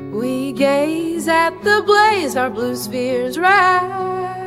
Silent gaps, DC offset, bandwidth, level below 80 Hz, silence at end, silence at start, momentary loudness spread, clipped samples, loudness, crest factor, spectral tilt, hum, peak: none; under 0.1%; 16 kHz; -54 dBFS; 0 s; 0 s; 9 LU; under 0.1%; -16 LUFS; 16 dB; -4 dB/octave; none; -2 dBFS